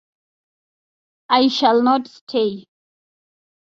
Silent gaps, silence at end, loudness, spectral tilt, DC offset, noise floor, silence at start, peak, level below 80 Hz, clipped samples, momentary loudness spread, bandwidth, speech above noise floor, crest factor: 2.21-2.27 s; 1.1 s; -18 LUFS; -4.5 dB/octave; under 0.1%; under -90 dBFS; 1.3 s; -2 dBFS; -66 dBFS; under 0.1%; 10 LU; 7.6 kHz; over 73 dB; 18 dB